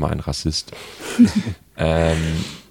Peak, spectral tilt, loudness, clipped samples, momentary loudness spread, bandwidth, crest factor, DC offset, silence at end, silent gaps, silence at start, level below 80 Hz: -2 dBFS; -5.5 dB/octave; -20 LUFS; under 0.1%; 14 LU; 16.5 kHz; 18 dB; under 0.1%; 0.1 s; none; 0 s; -34 dBFS